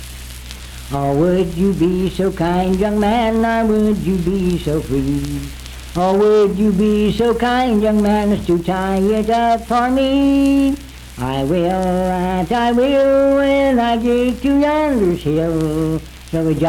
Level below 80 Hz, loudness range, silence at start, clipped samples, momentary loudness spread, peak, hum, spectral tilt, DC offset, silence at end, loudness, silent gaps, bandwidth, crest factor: -32 dBFS; 2 LU; 0 s; under 0.1%; 11 LU; -4 dBFS; none; -7 dB/octave; under 0.1%; 0 s; -16 LUFS; none; 18.5 kHz; 12 dB